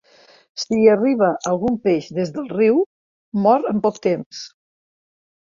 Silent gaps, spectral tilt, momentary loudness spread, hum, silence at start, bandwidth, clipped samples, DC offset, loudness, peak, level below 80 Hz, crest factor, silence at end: 2.86-3.32 s, 4.26-4.31 s; -6 dB/octave; 14 LU; none; 0.55 s; 7.4 kHz; under 0.1%; under 0.1%; -19 LUFS; -2 dBFS; -60 dBFS; 18 dB; 0.95 s